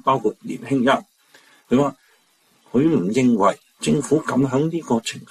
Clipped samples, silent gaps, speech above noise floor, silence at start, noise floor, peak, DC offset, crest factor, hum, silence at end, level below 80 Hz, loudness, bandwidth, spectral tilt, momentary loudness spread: under 0.1%; none; 41 dB; 0.05 s; -60 dBFS; -6 dBFS; under 0.1%; 16 dB; none; 0.05 s; -58 dBFS; -20 LUFS; 13 kHz; -6 dB/octave; 6 LU